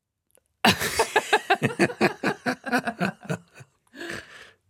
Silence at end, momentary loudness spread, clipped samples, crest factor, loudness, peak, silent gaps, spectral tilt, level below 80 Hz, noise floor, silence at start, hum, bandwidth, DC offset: 0.25 s; 14 LU; under 0.1%; 24 dB; -24 LUFS; -4 dBFS; none; -4 dB/octave; -60 dBFS; -67 dBFS; 0.65 s; none; 17 kHz; under 0.1%